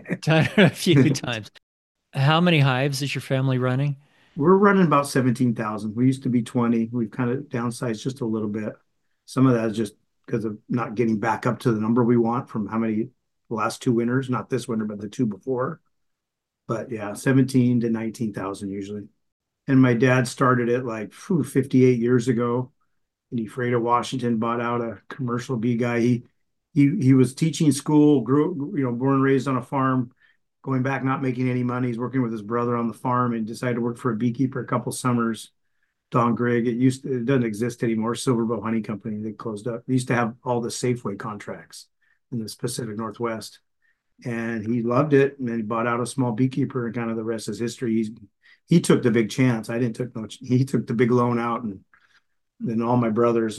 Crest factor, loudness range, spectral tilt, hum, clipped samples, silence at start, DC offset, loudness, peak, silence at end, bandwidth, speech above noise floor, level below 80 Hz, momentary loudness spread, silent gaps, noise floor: 20 dB; 6 LU; -6.5 dB/octave; none; under 0.1%; 0.05 s; under 0.1%; -23 LUFS; -2 dBFS; 0 s; 12.5 kHz; 61 dB; -64 dBFS; 13 LU; 1.63-1.95 s, 19.32-19.40 s; -83 dBFS